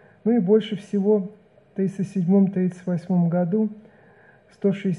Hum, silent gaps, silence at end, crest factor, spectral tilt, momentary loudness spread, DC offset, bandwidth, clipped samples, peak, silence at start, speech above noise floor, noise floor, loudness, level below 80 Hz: none; none; 0 s; 16 dB; -9 dB/octave; 9 LU; under 0.1%; 10 kHz; under 0.1%; -8 dBFS; 0.25 s; 32 dB; -53 dBFS; -23 LUFS; -72 dBFS